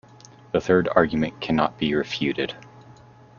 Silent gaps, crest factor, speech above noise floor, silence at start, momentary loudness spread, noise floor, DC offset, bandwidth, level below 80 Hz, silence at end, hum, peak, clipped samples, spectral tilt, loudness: none; 22 dB; 26 dB; 0.55 s; 9 LU; -49 dBFS; under 0.1%; 7.2 kHz; -52 dBFS; 0.45 s; none; -2 dBFS; under 0.1%; -6.5 dB/octave; -23 LUFS